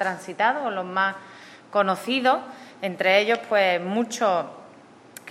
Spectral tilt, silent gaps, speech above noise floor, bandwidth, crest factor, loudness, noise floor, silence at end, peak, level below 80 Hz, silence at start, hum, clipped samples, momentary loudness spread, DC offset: -4 dB/octave; none; 26 dB; 15.5 kHz; 20 dB; -23 LUFS; -49 dBFS; 0 s; -6 dBFS; -84 dBFS; 0 s; none; under 0.1%; 15 LU; under 0.1%